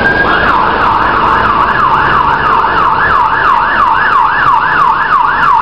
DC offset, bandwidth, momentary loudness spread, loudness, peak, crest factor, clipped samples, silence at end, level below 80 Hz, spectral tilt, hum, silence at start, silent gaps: 2%; 10.5 kHz; 1 LU; -8 LUFS; 0 dBFS; 8 dB; 0.3%; 0 s; -30 dBFS; -5.5 dB/octave; none; 0 s; none